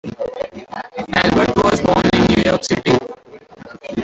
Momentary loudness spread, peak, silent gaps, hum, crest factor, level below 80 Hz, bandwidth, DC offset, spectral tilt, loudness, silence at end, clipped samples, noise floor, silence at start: 15 LU; -2 dBFS; none; none; 16 dB; -38 dBFS; 8.2 kHz; under 0.1%; -5.5 dB/octave; -16 LUFS; 0 s; under 0.1%; -40 dBFS; 0.05 s